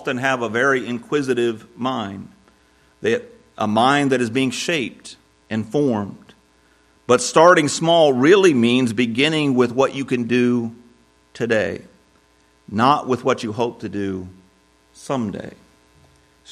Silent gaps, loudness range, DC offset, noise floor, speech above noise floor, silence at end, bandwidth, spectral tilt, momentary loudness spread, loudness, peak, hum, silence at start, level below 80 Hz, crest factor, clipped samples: none; 8 LU; under 0.1%; -57 dBFS; 39 dB; 0 s; 13 kHz; -4.5 dB/octave; 16 LU; -19 LUFS; 0 dBFS; none; 0 s; -62 dBFS; 20 dB; under 0.1%